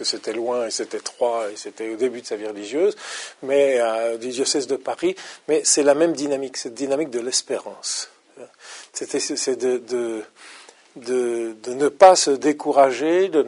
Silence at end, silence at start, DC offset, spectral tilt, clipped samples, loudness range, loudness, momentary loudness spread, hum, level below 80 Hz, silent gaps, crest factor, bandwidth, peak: 0 s; 0 s; under 0.1%; -2 dB/octave; under 0.1%; 7 LU; -21 LUFS; 15 LU; none; -72 dBFS; none; 22 dB; 11 kHz; 0 dBFS